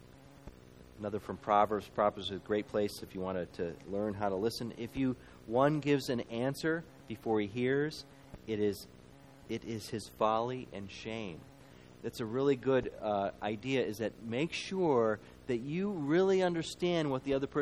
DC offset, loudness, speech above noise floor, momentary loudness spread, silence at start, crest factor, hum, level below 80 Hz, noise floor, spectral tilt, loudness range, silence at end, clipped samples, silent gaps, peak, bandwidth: under 0.1%; -34 LUFS; 23 dB; 14 LU; 0 s; 20 dB; none; -62 dBFS; -56 dBFS; -6 dB/octave; 5 LU; 0 s; under 0.1%; none; -14 dBFS; 15 kHz